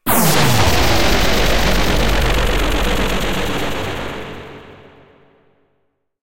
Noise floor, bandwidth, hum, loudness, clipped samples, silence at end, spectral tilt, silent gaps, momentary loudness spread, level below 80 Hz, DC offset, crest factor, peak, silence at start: -65 dBFS; 16.5 kHz; none; -16 LUFS; under 0.1%; 0 s; -4 dB/octave; none; 13 LU; -24 dBFS; 7%; 16 dB; -2 dBFS; 0 s